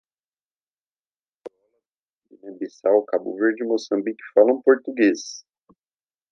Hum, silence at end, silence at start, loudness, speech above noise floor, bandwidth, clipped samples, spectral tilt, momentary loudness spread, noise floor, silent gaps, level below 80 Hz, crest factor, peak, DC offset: none; 0.9 s; 1.45 s; -21 LUFS; over 69 dB; 7.6 kHz; under 0.1%; -4.5 dB/octave; 17 LU; under -90 dBFS; 1.91-2.21 s; -82 dBFS; 22 dB; -2 dBFS; under 0.1%